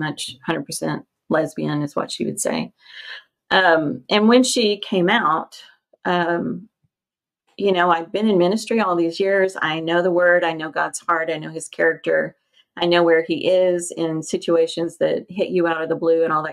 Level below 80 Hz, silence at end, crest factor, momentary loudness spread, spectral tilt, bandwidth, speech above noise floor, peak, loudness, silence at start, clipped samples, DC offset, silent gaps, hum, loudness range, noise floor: -68 dBFS; 0 s; 18 dB; 11 LU; -4.5 dB/octave; 14 kHz; over 71 dB; -2 dBFS; -20 LUFS; 0 s; under 0.1%; under 0.1%; none; none; 4 LU; under -90 dBFS